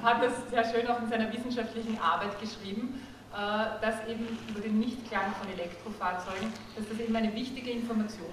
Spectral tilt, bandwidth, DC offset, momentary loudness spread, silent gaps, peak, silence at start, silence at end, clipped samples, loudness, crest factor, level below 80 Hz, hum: -5 dB/octave; 13.5 kHz; under 0.1%; 9 LU; none; -12 dBFS; 0 s; 0 s; under 0.1%; -33 LUFS; 20 dB; -58 dBFS; none